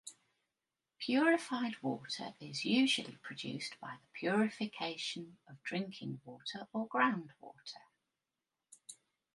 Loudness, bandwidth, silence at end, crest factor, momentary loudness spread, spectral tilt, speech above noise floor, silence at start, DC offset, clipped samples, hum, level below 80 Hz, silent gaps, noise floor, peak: -37 LUFS; 11.5 kHz; 0.4 s; 22 dB; 21 LU; -4 dB/octave; over 53 dB; 0.05 s; under 0.1%; under 0.1%; none; -86 dBFS; none; under -90 dBFS; -16 dBFS